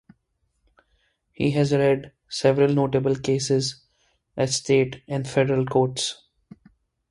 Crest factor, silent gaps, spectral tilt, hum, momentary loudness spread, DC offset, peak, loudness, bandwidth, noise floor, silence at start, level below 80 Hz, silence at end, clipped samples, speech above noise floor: 18 dB; none; -5.5 dB/octave; none; 9 LU; under 0.1%; -6 dBFS; -23 LUFS; 11.5 kHz; -72 dBFS; 1.4 s; -56 dBFS; 0.95 s; under 0.1%; 50 dB